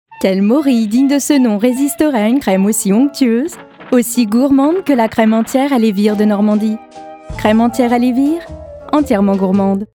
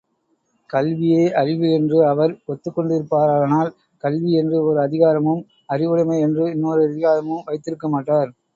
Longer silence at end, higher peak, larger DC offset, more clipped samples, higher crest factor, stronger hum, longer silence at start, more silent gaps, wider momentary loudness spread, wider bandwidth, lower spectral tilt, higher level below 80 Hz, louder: second, 0.1 s vs 0.25 s; about the same, 0 dBFS vs -2 dBFS; neither; neither; about the same, 12 dB vs 16 dB; neither; second, 0.1 s vs 0.7 s; neither; second, 6 LU vs 10 LU; first, 19 kHz vs 7.4 kHz; second, -5.5 dB/octave vs -8.5 dB/octave; first, -44 dBFS vs -64 dBFS; first, -13 LUFS vs -19 LUFS